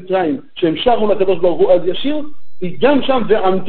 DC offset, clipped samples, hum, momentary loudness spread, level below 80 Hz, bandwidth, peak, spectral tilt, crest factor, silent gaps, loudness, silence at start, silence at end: 10%; under 0.1%; none; 11 LU; -46 dBFS; 4.5 kHz; 0 dBFS; -11 dB/octave; 14 dB; none; -15 LUFS; 0 s; 0 s